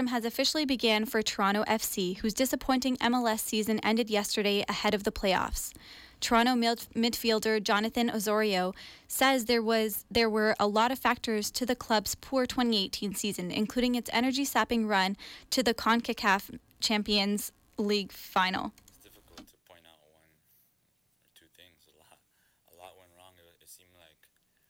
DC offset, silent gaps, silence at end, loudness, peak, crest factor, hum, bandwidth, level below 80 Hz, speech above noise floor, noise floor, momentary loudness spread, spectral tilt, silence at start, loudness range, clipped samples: under 0.1%; none; 0.95 s; -29 LUFS; -14 dBFS; 16 dB; none; 18.5 kHz; -54 dBFS; 43 dB; -72 dBFS; 6 LU; -3 dB/octave; 0 s; 4 LU; under 0.1%